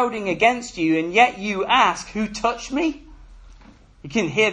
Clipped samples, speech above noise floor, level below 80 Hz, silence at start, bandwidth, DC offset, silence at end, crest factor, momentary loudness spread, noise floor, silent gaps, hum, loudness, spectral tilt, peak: under 0.1%; 27 dB; -48 dBFS; 0 s; 10.5 kHz; under 0.1%; 0 s; 20 dB; 9 LU; -48 dBFS; none; none; -20 LUFS; -4 dB/octave; -2 dBFS